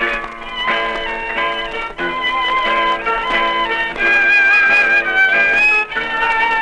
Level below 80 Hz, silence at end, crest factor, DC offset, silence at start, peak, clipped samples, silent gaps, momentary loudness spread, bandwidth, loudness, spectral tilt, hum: -40 dBFS; 0 s; 12 dB; under 0.1%; 0 s; -4 dBFS; under 0.1%; none; 11 LU; 10.5 kHz; -14 LUFS; -2.5 dB/octave; none